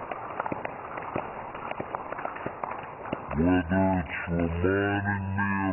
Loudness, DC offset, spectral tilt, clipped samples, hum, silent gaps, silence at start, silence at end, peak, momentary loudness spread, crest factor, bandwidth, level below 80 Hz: -30 LUFS; under 0.1%; -6.5 dB/octave; under 0.1%; none; none; 0 s; 0 s; -12 dBFS; 11 LU; 16 dB; 3.2 kHz; -50 dBFS